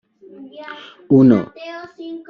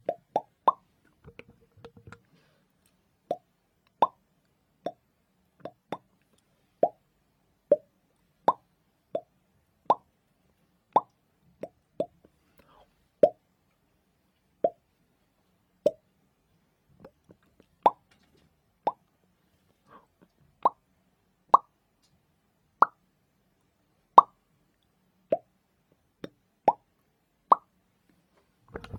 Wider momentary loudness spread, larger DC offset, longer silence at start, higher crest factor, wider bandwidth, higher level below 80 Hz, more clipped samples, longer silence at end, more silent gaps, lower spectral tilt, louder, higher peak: about the same, 23 LU vs 22 LU; neither; first, 0.6 s vs 0.1 s; second, 16 dB vs 32 dB; second, 5.8 kHz vs 9.8 kHz; first, -56 dBFS vs -70 dBFS; neither; about the same, 0.1 s vs 0 s; neither; first, -8 dB/octave vs -6.5 dB/octave; first, -13 LUFS vs -28 LUFS; about the same, -2 dBFS vs 0 dBFS